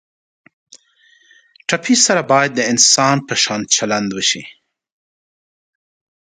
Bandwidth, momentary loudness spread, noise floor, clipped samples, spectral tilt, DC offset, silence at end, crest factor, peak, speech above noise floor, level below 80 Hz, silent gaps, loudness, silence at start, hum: 16 kHz; 10 LU; -54 dBFS; under 0.1%; -2 dB/octave; under 0.1%; 1.7 s; 18 dB; 0 dBFS; 39 dB; -62 dBFS; none; -14 LUFS; 0.75 s; none